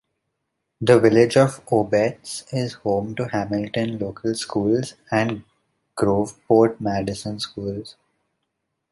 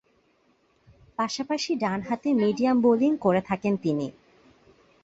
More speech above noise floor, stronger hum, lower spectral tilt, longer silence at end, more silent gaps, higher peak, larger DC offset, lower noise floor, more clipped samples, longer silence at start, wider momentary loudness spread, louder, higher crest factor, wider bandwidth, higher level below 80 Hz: first, 57 dB vs 42 dB; neither; about the same, -6 dB/octave vs -6 dB/octave; about the same, 1 s vs 0.95 s; neither; first, -2 dBFS vs -8 dBFS; neither; first, -77 dBFS vs -66 dBFS; neither; second, 0.8 s vs 1.2 s; first, 13 LU vs 9 LU; first, -21 LUFS vs -25 LUFS; about the same, 20 dB vs 18 dB; first, 11.5 kHz vs 8 kHz; first, -54 dBFS vs -64 dBFS